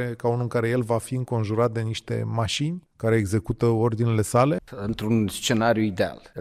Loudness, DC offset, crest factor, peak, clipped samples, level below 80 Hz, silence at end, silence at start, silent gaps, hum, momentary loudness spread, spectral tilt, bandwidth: -24 LUFS; under 0.1%; 18 dB; -6 dBFS; under 0.1%; -52 dBFS; 0 s; 0 s; none; none; 7 LU; -6 dB/octave; 14.5 kHz